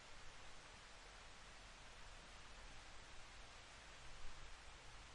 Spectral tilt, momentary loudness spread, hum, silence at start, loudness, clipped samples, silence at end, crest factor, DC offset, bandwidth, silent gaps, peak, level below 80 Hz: -2 dB/octave; 1 LU; none; 0 s; -59 LUFS; under 0.1%; 0 s; 18 dB; under 0.1%; 11 kHz; none; -40 dBFS; -62 dBFS